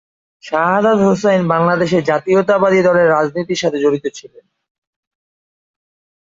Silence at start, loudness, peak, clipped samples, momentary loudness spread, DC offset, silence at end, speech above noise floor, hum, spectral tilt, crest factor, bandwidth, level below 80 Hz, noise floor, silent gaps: 0.45 s; -14 LUFS; -2 dBFS; under 0.1%; 6 LU; under 0.1%; 2.1 s; over 76 dB; none; -6 dB/octave; 14 dB; 7.8 kHz; -56 dBFS; under -90 dBFS; none